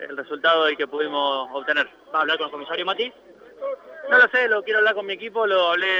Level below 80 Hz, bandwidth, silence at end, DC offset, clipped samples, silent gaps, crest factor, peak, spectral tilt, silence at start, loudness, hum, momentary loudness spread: -74 dBFS; 7.4 kHz; 0 s; under 0.1%; under 0.1%; none; 18 dB; -4 dBFS; -3.5 dB/octave; 0 s; -21 LUFS; none; 14 LU